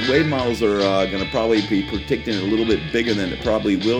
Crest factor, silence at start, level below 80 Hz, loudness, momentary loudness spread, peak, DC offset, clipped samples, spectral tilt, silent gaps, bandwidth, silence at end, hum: 16 dB; 0 s; -40 dBFS; -20 LUFS; 4 LU; -4 dBFS; under 0.1%; under 0.1%; -5.5 dB/octave; none; 14.5 kHz; 0 s; none